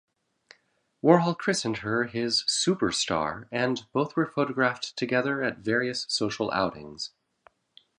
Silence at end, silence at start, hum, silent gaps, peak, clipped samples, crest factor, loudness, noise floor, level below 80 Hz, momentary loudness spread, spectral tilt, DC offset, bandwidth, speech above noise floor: 0.9 s; 1.05 s; none; none; -4 dBFS; under 0.1%; 24 dB; -26 LUFS; -68 dBFS; -62 dBFS; 8 LU; -4 dB/octave; under 0.1%; 11 kHz; 42 dB